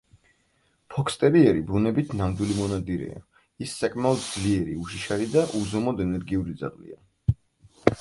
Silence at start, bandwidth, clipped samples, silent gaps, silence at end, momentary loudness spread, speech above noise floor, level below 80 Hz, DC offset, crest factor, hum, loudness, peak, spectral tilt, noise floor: 0.9 s; 11.5 kHz; under 0.1%; none; 0 s; 14 LU; 43 dB; -44 dBFS; under 0.1%; 26 dB; none; -26 LUFS; 0 dBFS; -6.5 dB/octave; -68 dBFS